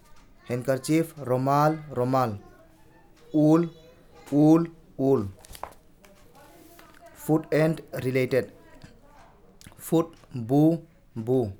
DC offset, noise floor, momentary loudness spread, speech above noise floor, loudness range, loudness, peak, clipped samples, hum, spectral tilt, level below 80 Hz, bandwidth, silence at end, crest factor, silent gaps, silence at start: under 0.1%; -54 dBFS; 18 LU; 31 dB; 4 LU; -25 LUFS; -8 dBFS; under 0.1%; none; -7.5 dB/octave; -58 dBFS; 18.5 kHz; 0.05 s; 18 dB; none; 0.5 s